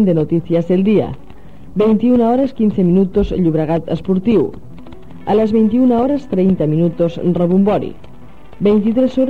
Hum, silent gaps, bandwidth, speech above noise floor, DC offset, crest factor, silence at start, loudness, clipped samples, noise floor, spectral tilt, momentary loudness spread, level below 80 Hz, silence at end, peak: none; none; 6.4 kHz; 26 dB; 2%; 10 dB; 0 s; -15 LUFS; under 0.1%; -40 dBFS; -10 dB/octave; 6 LU; -38 dBFS; 0 s; -4 dBFS